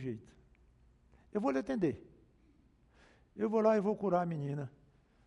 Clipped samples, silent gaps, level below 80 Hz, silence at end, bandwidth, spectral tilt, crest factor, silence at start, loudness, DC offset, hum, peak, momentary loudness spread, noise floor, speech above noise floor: under 0.1%; none; -68 dBFS; 0.55 s; 9.4 kHz; -8.5 dB/octave; 20 dB; 0 s; -34 LUFS; under 0.1%; none; -16 dBFS; 19 LU; -67 dBFS; 34 dB